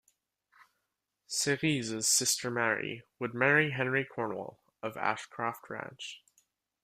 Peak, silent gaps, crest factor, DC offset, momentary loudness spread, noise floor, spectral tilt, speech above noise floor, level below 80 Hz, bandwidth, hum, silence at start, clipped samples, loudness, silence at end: -12 dBFS; none; 22 dB; under 0.1%; 16 LU; -84 dBFS; -2.5 dB/octave; 52 dB; -74 dBFS; 15.5 kHz; none; 1.3 s; under 0.1%; -30 LUFS; 0.65 s